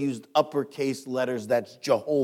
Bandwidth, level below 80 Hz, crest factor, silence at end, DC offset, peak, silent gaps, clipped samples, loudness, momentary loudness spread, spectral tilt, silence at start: 16 kHz; -80 dBFS; 18 dB; 0 s; under 0.1%; -8 dBFS; none; under 0.1%; -27 LUFS; 4 LU; -5.5 dB/octave; 0 s